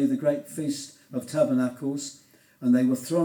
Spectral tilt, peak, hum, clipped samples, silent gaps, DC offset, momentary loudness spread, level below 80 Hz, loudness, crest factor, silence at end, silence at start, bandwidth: -6 dB/octave; -8 dBFS; none; under 0.1%; none; under 0.1%; 13 LU; -78 dBFS; -27 LUFS; 16 dB; 0 s; 0 s; over 20 kHz